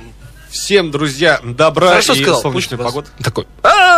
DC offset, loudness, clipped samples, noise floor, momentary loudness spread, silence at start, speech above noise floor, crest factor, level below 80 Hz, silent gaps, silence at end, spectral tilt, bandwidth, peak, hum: under 0.1%; -13 LUFS; under 0.1%; -36 dBFS; 12 LU; 0 s; 23 dB; 12 dB; -40 dBFS; none; 0 s; -3.5 dB/octave; 16 kHz; 0 dBFS; none